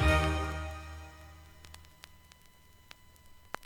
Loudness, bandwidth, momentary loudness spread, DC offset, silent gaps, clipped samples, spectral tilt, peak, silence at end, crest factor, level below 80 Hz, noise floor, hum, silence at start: -34 LUFS; 17 kHz; 25 LU; under 0.1%; none; under 0.1%; -5.5 dB/octave; -14 dBFS; 0 s; 22 dB; -40 dBFS; -59 dBFS; 60 Hz at -70 dBFS; 0 s